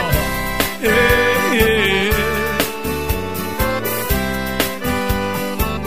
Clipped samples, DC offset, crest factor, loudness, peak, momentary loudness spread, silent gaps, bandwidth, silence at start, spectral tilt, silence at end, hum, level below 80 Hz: under 0.1%; 2%; 16 dB; -17 LUFS; -2 dBFS; 8 LU; none; 16 kHz; 0 s; -4 dB/octave; 0 s; none; -28 dBFS